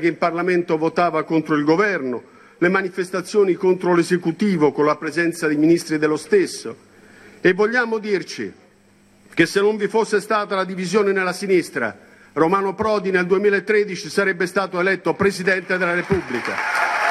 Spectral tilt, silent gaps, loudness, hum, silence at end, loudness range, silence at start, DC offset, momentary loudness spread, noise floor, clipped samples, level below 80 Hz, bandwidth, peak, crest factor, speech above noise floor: -5.5 dB/octave; none; -19 LUFS; none; 0 s; 3 LU; 0 s; under 0.1%; 7 LU; -54 dBFS; under 0.1%; -58 dBFS; 13 kHz; -2 dBFS; 18 dB; 35 dB